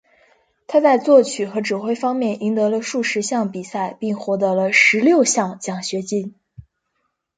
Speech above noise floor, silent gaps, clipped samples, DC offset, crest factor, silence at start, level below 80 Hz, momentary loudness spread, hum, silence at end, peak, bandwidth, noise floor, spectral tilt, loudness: 54 dB; none; under 0.1%; under 0.1%; 18 dB; 0.7 s; -64 dBFS; 12 LU; none; 0.75 s; -2 dBFS; 9.4 kHz; -73 dBFS; -4 dB/octave; -18 LUFS